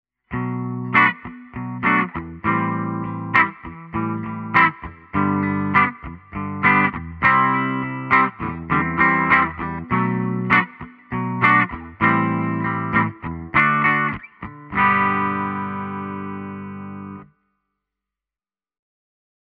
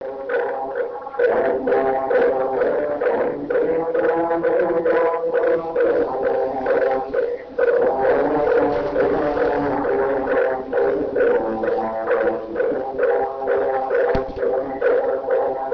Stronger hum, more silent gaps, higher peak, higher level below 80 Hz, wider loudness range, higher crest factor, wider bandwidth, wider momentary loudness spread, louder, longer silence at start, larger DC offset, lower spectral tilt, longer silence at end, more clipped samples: neither; neither; first, 0 dBFS vs -4 dBFS; about the same, -48 dBFS vs -46 dBFS; first, 6 LU vs 1 LU; about the same, 20 dB vs 16 dB; about the same, 5.8 kHz vs 5.4 kHz; first, 16 LU vs 5 LU; about the same, -19 LUFS vs -20 LUFS; first, 0.3 s vs 0 s; neither; second, -4.5 dB/octave vs -8 dB/octave; first, 2.3 s vs 0 s; neither